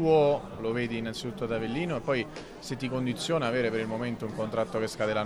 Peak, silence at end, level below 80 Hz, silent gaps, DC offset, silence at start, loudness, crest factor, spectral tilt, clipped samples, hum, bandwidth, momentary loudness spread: -12 dBFS; 0 s; -54 dBFS; none; under 0.1%; 0 s; -30 LUFS; 16 dB; -5.5 dB/octave; under 0.1%; none; 14.5 kHz; 8 LU